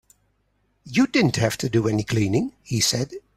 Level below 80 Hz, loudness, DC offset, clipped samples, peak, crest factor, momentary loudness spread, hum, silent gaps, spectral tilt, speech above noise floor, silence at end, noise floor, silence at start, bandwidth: -52 dBFS; -22 LUFS; under 0.1%; under 0.1%; -6 dBFS; 18 dB; 6 LU; 50 Hz at -45 dBFS; none; -4.5 dB/octave; 46 dB; 0.15 s; -68 dBFS; 0.85 s; 15 kHz